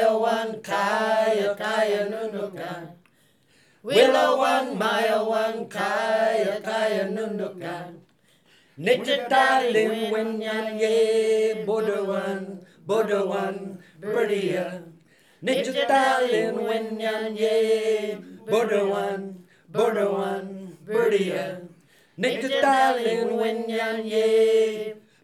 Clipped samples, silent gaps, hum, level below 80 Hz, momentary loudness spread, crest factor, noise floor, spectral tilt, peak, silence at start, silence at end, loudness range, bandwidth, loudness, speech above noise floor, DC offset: under 0.1%; none; none; -86 dBFS; 14 LU; 20 dB; -62 dBFS; -4.5 dB/octave; -4 dBFS; 0 s; 0.25 s; 4 LU; 14.5 kHz; -24 LUFS; 39 dB; under 0.1%